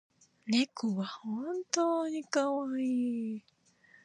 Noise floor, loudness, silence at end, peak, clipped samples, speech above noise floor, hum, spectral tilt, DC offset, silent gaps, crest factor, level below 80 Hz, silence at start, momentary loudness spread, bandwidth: -64 dBFS; -33 LUFS; 0.65 s; -12 dBFS; under 0.1%; 31 dB; none; -4 dB/octave; under 0.1%; none; 22 dB; -86 dBFS; 0.45 s; 8 LU; 10.5 kHz